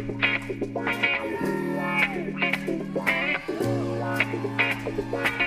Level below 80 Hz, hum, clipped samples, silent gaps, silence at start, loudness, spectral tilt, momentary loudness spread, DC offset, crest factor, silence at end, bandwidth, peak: -52 dBFS; none; under 0.1%; none; 0 s; -26 LUFS; -5.5 dB/octave; 5 LU; under 0.1%; 20 dB; 0 s; 15.5 kHz; -6 dBFS